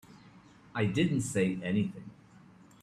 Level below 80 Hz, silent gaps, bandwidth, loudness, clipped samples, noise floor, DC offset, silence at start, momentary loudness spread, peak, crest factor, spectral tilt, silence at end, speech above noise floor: -64 dBFS; none; 13.5 kHz; -31 LUFS; under 0.1%; -57 dBFS; under 0.1%; 0.1 s; 15 LU; -16 dBFS; 18 dB; -6 dB/octave; 0.7 s; 27 dB